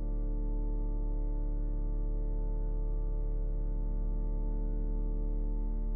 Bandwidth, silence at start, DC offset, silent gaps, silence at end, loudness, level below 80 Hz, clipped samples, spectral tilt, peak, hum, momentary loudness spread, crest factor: 1.5 kHz; 0 s; under 0.1%; none; 0 s; -38 LUFS; -32 dBFS; under 0.1%; -13.5 dB/octave; -24 dBFS; none; 0 LU; 6 dB